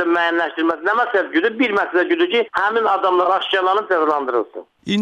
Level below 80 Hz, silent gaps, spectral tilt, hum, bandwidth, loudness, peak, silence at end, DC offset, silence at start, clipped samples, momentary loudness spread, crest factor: -66 dBFS; none; -5.5 dB/octave; none; 8 kHz; -18 LUFS; -6 dBFS; 0 s; under 0.1%; 0 s; under 0.1%; 4 LU; 12 dB